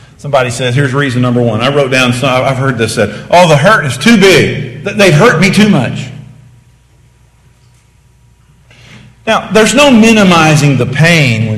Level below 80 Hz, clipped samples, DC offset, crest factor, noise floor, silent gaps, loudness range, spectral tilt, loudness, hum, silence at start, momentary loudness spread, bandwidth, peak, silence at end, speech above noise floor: -40 dBFS; 2%; under 0.1%; 10 dB; -45 dBFS; none; 9 LU; -5 dB/octave; -8 LUFS; none; 0.25 s; 9 LU; 16 kHz; 0 dBFS; 0 s; 38 dB